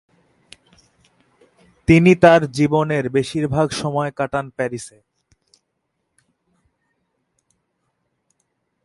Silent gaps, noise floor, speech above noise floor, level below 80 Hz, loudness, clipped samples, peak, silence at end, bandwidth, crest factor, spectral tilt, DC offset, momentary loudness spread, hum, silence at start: none; -74 dBFS; 57 dB; -46 dBFS; -17 LUFS; under 0.1%; 0 dBFS; 3.95 s; 11.5 kHz; 20 dB; -6.5 dB/octave; under 0.1%; 14 LU; none; 1.9 s